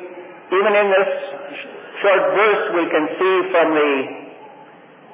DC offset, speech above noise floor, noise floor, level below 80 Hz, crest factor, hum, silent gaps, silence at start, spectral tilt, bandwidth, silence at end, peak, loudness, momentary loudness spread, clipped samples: under 0.1%; 27 dB; -44 dBFS; -90 dBFS; 14 dB; none; none; 0 s; -8 dB/octave; 3.8 kHz; 0 s; -4 dBFS; -17 LUFS; 17 LU; under 0.1%